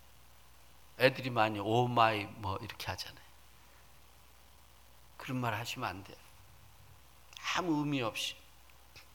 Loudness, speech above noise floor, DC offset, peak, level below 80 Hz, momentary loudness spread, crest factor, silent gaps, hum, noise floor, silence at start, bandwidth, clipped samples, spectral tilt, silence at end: -34 LUFS; 27 dB; under 0.1%; -8 dBFS; -64 dBFS; 22 LU; 28 dB; none; none; -61 dBFS; 1 s; 19 kHz; under 0.1%; -5 dB/octave; 0.15 s